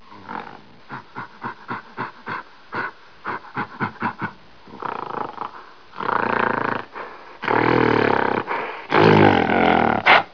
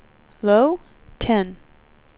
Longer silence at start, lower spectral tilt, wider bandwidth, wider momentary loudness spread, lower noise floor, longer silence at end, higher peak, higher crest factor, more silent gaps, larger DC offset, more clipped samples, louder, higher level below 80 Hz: second, 0.1 s vs 0.45 s; second, -7 dB/octave vs -10.5 dB/octave; first, 5.4 kHz vs 4 kHz; first, 20 LU vs 13 LU; second, -44 dBFS vs -53 dBFS; second, 0.05 s vs 0.65 s; first, 0 dBFS vs -4 dBFS; about the same, 22 dB vs 18 dB; neither; first, 0.4% vs under 0.1%; neither; about the same, -20 LUFS vs -20 LUFS; second, -54 dBFS vs -46 dBFS